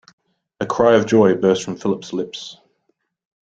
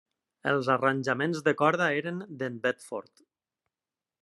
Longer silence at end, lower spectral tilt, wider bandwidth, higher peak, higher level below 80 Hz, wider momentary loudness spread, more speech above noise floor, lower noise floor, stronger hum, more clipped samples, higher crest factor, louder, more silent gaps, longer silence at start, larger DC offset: second, 0.95 s vs 1.2 s; about the same, -5.5 dB/octave vs -5.5 dB/octave; second, 8.4 kHz vs 12 kHz; first, -2 dBFS vs -8 dBFS; first, -56 dBFS vs -76 dBFS; first, 16 LU vs 12 LU; second, 52 dB vs over 62 dB; second, -69 dBFS vs under -90 dBFS; neither; neither; about the same, 18 dB vs 22 dB; first, -17 LUFS vs -28 LUFS; neither; first, 0.6 s vs 0.45 s; neither